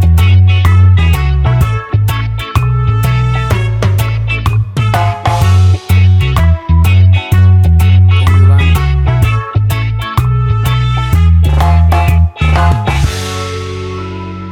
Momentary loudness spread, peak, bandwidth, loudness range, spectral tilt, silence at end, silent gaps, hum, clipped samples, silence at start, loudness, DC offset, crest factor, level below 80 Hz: 7 LU; 0 dBFS; 16 kHz; 4 LU; -6.5 dB/octave; 0 s; none; none; under 0.1%; 0 s; -10 LUFS; under 0.1%; 8 dB; -16 dBFS